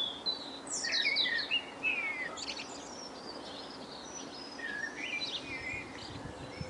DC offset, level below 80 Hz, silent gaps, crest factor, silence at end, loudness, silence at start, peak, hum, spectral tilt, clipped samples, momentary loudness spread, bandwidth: under 0.1%; -66 dBFS; none; 18 dB; 0 s; -35 LUFS; 0 s; -20 dBFS; none; -1.5 dB/octave; under 0.1%; 15 LU; 11.5 kHz